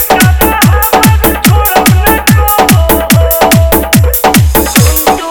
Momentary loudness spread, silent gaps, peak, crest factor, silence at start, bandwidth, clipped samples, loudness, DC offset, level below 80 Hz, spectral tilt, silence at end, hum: 1 LU; none; 0 dBFS; 6 dB; 0 s; over 20 kHz; 3%; -6 LUFS; under 0.1%; -14 dBFS; -4.5 dB/octave; 0 s; none